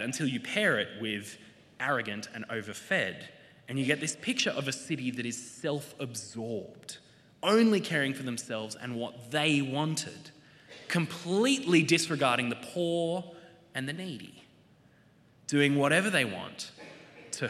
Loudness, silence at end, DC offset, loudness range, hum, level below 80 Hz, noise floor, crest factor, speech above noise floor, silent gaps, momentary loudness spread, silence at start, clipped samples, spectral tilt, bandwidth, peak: -30 LUFS; 0 s; under 0.1%; 5 LU; none; -78 dBFS; -62 dBFS; 22 dB; 31 dB; none; 19 LU; 0 s; under 0.1%; -4 dB/octave; 14.5 kHz; -10 dBFS